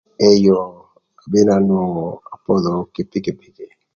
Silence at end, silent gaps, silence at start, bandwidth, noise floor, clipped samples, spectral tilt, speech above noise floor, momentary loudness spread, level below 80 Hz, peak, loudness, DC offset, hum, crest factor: 0.3 s; none; 0.2 s; 7.2 kHz; -50 dBFS; under 0.1%; -7 dB/octave; 34 dB; 15 LU; -52 dBFS; 0 dBFS; -17 LUFS; under 0.1%; none; 18 dB